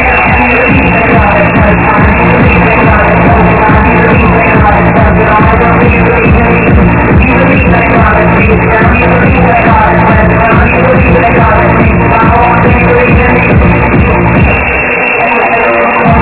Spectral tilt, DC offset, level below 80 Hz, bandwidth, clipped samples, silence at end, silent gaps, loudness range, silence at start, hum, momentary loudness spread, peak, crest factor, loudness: -11 dB/octave; under 0.1%; -14 dBFS; 4 kHz; 7%; 0 s; none; 1 LU; 0 s; none; 1 LU; 0 dBFS; 4 dB; -5 LUFS